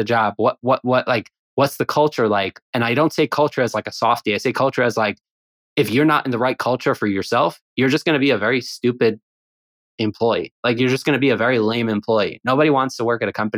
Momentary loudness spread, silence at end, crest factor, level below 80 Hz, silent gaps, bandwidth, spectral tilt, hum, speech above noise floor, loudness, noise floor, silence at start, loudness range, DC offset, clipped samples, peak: 5 LU; 0 s; 16 dB; -68 dBFS; 1.39-1.57 s, 2.62-2.73 s, 5.31-5.76 s, 7.61-7.77 s, 9.23-9.98 s, 10.51-10.63 s; 19 kHz; -5.5 dB/octave; none; over 71 dB; -19 LUFS; under -90 dBFS; 0 s; 2 LU; under 0.1%; under 0.1%; -4 dBFS